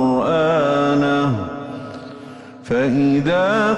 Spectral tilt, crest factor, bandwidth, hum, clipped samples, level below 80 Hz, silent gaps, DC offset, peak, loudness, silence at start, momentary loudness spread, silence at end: -7 dB/octave; 10 dB; 8.8 kHz; none; under 0.1%; -52 dBFS; none; under 0.1%; -8 dBFS; -17 LUFS; 0 s; 19 LU; 0 s